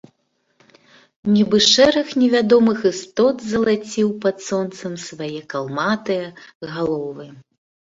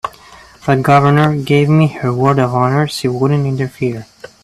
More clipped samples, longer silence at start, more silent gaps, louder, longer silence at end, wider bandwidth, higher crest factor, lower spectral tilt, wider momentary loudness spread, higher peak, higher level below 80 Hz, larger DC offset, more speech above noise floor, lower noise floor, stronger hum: neither; first, 1.25 s vs 0.05 s; first, 6.55-6.61 s vs none; second, -18 LUFS vs -13 LUFS; first, 0.55 s vs 0.4 s; second, 7.8 kHz vs 13.5 kHz; about the same, 18 dB vs 14 dB; second, -4 dB/octave vs -7.5 dB/octave; first, 16 LU vs 11 LU; about the same, 0 dBFS vs 0 dBFS; second, -58 dBFS vs -48 dBFS; neither; first, 49 dB vs 28 dB; first, -68 dBFS vs -40 dBFS; neither